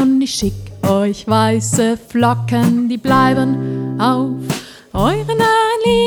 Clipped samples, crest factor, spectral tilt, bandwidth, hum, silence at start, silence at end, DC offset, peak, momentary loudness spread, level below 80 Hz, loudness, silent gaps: under 0.1%; 14 dB; -5.5 dB/octave; over 20 kHz; none; 0 s; 0 s; under 0.1%; 0 dBFS; 8 LU; -38 dBFS; -16 LUFS; none